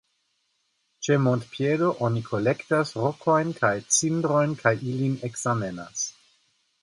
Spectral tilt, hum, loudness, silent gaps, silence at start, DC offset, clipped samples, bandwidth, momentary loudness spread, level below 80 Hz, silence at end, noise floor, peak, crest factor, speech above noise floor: -5 dB/octave; none; -25 LUFS; none; 1 s; under 0.1%; under 0.1%; 11.5 kHz; 8 LU; -64 dBFS; 0.7 s; -73 dBFS; -6 dBFS; 20 dB; 48 dB